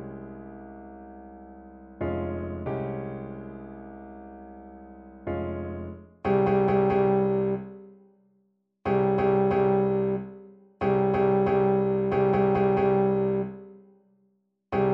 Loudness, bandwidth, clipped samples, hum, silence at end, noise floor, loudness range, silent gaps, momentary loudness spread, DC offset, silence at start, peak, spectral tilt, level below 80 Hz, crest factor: -25 LUFS; 5 kHz; under 0.1%; none; 0 s; -70 dBFS; 12 LU; none; 22 LU; under 0.1%; 0 s; -12 dBFS; -10.5 dB/octave; -52 dBFS; 16 dB